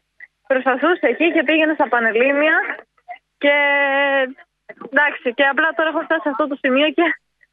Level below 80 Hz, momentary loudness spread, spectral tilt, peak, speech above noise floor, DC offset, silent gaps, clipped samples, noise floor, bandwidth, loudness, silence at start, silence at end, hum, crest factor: -72 dBFS; 6 LU; -6 dB/octave; -2 dBFS; 30 dB; under 0.1%; none; under 0.1%; -47 dBFS; 4.6 kHz; -17 LUFS; 0.2 s; 0.35 s; none; 16 dB